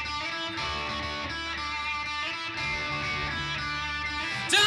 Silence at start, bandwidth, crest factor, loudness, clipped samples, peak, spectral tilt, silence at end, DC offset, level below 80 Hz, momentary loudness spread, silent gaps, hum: 0 s; 16 kHz; 20 dB; -30 LUFS; under 0.1%; -10 dBFS; -2 dB/octave; 0 s; under 0.1%; -48 dBFS; 2 LU; none; none